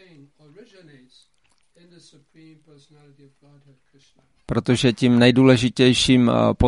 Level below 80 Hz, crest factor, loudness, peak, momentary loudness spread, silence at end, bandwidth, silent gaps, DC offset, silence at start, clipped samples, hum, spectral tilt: -44 dBFS; 18 dB; -17 LUFS; -2 dBFS; 7 LU; 0 s; 11.5 kHz; none; under 0.1%; 4.5 s; under 0.1%; none; -5.5 dB/octave